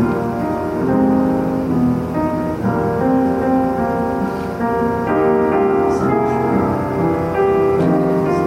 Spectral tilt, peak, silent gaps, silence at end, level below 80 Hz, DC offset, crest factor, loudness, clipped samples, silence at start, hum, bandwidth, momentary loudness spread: -8.5 dB/octave; -4 dBFS; none; 0 s; -40 dBFS; under 0.1%; 12 dB; -17 LUFS; under 0.1%; 0 s; none; 15.5 kHz; 5 LU